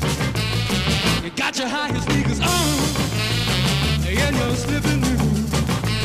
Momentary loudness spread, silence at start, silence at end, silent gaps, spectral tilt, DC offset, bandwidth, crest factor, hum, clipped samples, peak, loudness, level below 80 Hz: 3 LU; 0 s; 0 s; none; -4.5 dB/octave; under 0.1%; 16 kHz; 14 dB; none; under 0.1%; -6 dBFS; -20 LUFS; -30 dBFS